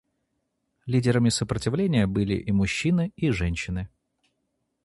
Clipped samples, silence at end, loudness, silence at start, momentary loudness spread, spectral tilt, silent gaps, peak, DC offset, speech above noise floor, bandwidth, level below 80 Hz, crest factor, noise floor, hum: under 0.1%; 0.95 s; -25 LUFS; 0.85 s; 9 LU; -6 dB/octave; none; -8 dBFS; under 0.1%; 53 dB; 11.5 kHz; -42 dBFS; 18 dB; -77 dBFS; none